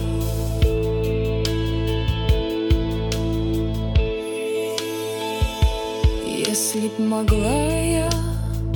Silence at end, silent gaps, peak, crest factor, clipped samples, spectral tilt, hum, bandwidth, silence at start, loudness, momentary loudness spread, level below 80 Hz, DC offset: 0 s; none; -4 dBFS; 16 dB; under 0.1%; -5.5 dB/octave; none; 18 kHz; 0 s; -22 LUFS; 5 LU; -26 dBFS; under 0.1%